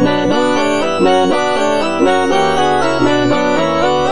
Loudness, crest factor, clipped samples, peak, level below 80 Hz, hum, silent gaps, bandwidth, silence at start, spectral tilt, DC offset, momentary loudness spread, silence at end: -13 LUFS; 12 dB; under 0.1%; 0 dBFS; -42 dBFS; none; none; 10.5 kHz; 0 s; -5 dB/octave; 5%; 2 LU; 0 s